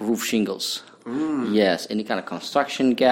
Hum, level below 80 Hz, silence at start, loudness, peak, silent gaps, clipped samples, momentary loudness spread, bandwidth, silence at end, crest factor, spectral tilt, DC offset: none; -64 dBFS; 0 s; -24 LUFS; -4 dBFS; none; under 0.1%; 8 LU; 17 kHz; 0 s; 18 dB; -4 dB/octave; under 0.1%